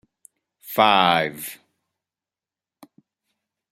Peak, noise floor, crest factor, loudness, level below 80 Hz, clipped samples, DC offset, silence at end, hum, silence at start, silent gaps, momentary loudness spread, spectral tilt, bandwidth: 0 dBFS; under -90 dBFS; 24 dB; -19 LUFS; -68 dBFS; under 0.1%; under 0.1%; 2.15 s; none; 0.65 s; none; 19 LU; -3.5 dB/octave; 16 kHz